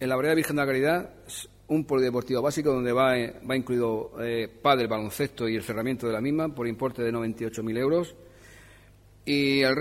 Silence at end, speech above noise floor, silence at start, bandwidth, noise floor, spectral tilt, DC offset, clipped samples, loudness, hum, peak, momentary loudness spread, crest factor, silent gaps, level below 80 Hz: 0 s; 28 dB; 0 s; 16 kHz; -54 dBFS; -5.5 dB/octave; under 0.1%; under 0.1%; -27 LUFS; none; -8 dBFS; 8 LU; 18 dB; none; -56 dBFS